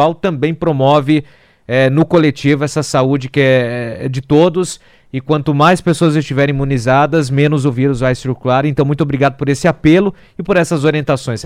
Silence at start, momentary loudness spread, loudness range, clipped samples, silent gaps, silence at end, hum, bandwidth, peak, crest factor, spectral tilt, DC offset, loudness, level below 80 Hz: 0 s; 7 LU; 1 LU; under 0.1%; none; 0 s; none; 13 kHz; 0 dBFS; 12 dB; -6.5 dB/octave; under 0.1%; -13 LUFS; -40 dBFS